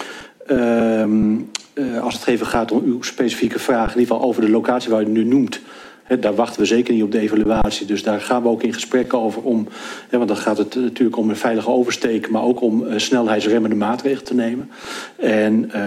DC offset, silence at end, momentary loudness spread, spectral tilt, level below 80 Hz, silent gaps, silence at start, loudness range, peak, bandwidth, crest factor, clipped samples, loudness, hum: under 0.1%; 0 s; 7 LU; -5 dB/octave; -42 dBFS; none; 0 s; 2 LU; -4 dBFS; 15 kHz; 14 dB; under 0.1%; -18 LUFS; none